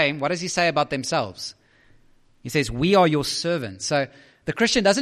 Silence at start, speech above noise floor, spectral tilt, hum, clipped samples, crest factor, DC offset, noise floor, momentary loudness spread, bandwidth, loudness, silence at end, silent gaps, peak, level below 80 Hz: 0 s; 33 dB; -4 dB/octave; none; under 0.1%; 18 dB; under 0.1%; -55 dBFS; 14 LU; 14.5 kHz; -22 LUFS; 0 s; none; -6 dBFS; -48 dBFS